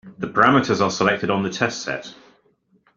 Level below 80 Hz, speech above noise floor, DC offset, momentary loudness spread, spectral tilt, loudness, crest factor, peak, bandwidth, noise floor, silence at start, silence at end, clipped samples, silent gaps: -58 dBFS; 42 dB; under 0.1%; 13 LU; -5 dB/octave; -20 LUFS; 20 dB; -2 dBFS; 7.6 kHz; -62 dBFS; 0.05 s; 0.85 s; under 0.1%; none